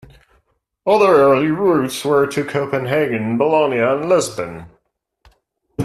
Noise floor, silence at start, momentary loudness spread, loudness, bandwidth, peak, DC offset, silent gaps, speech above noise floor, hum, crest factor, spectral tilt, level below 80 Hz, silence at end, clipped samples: -67 dBFS; 0.85 s; 13 LU; -16 LUFS; 13.5 kHz; -2 dBFS; under 0.1%; none; 51 dB; none; 16 dB; -5.5 dB/octave; -56 dBFS; 0 s; under 0.1%